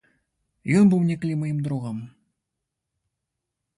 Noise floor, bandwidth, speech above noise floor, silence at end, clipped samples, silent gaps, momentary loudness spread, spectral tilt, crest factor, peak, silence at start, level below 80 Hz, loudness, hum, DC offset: -83 dBFS; 11.5 kHz; 61 dB; 1.7 s; under 0.1%; none; 17 LU; -8 dB/octave; 18 dB; -8 dBFS; 0.65 s; -64 dBFS; -22 LUFS; none; under 0.1%